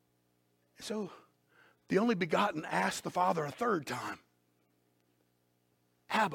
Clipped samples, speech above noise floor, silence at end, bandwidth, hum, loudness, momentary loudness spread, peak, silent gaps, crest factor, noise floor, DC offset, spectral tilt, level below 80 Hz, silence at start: under 0.1%; 42 dB; 0 s; 17 kHz; 60 Hz at -60 dBFS; -33 LUFS; 12 LU; -16 dBFS; none; 20 dB; -75 dBFS; under 0.1%; -5 dB/octave; -76 dBFS; 0.8 s